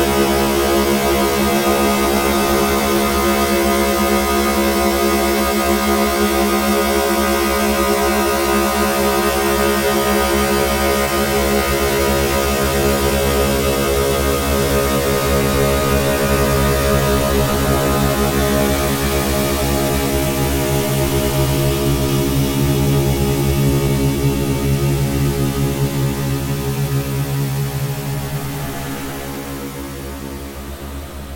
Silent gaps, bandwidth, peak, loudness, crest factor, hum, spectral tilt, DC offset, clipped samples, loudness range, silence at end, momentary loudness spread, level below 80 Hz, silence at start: none; 17 kHz; -2 dBFS; -16 LUFS; 14 dB; none; -4.5 dB/octave; under 0.1%; under 0.1%; 5 LU; 0 s; 7 LU; -26 dBFS; 0 s